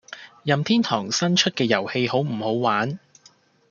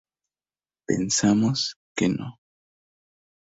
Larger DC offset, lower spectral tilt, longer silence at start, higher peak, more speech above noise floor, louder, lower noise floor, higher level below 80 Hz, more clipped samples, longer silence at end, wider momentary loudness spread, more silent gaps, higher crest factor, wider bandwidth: neither; about the same, -4.5 dB/octave vs -4 dB/octave; second, 0.1 s vs 0.9 s; first, -2 dBFS vs -8 dBFS; second, 34 dB vs over 67 dB; about the same, -22 LUFS vs -24 LUFS; second, -56 dBFS vs under -90 dBFS; second, -68 dBFS vs -58 dBFS; neither; second, 0.75 s vs 1.1 s; second, 10 LU vs 14 LU; second, none vs 1.76-1.95 s; about the same, 20 dB vs 18 dB; about the same, 7.4 kHz vs 8 kHz